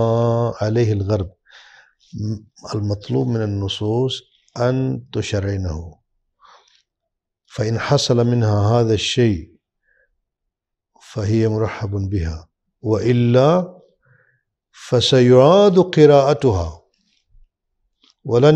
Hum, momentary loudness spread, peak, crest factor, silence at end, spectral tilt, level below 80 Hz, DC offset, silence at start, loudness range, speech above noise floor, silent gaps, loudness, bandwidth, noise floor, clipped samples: none; 17 LU; 0 dBFS; 18 dB; 0 s; -6.5 dB/octave; -44 dBFS; under 0.1%; 0 s; 10 LU; 64 dB; none; -17 LUFS; 9 kHz; -80 dBFS; under 0.1%